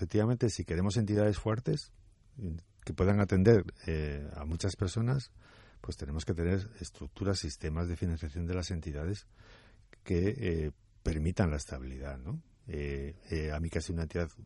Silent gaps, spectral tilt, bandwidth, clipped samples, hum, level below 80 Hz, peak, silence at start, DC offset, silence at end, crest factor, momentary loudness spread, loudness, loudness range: none; -6.5 dB/octave; 11.5 kHz; under 0.1%; none; -46 dBFS; -12 dBFS; 0 s; under 0.1%; 0 s; 22 dB; 14 LU; -34 LUFS; 6 LU